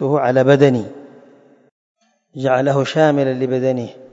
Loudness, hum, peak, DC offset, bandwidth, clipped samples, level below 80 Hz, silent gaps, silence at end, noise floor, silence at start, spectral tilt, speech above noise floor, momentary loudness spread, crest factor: -16 LUFS; none; 0 dBFS; under 0.1%; 8 kHz; under 0.1%; -64 dBFS; 1.71-1.95 s; 0.05 s; -48 dBFS; 0 s; -7 dB/octave; 33 dB; 12 LU; 18 dB